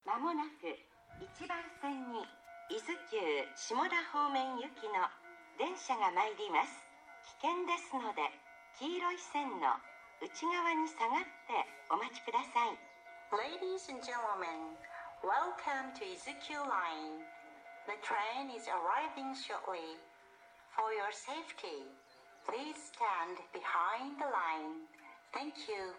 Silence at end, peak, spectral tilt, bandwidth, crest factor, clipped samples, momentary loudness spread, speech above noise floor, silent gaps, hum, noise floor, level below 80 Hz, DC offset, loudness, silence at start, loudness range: 0 s; -18 dBFS; -2 dB/octave; 11 kHz; 22 dB; under 0.1%; 16 LU; 23 dB; none; none; -62 dBFS; -82 dBFS; under 0.1%; -39 LUFS; 0.05 s; 4 LU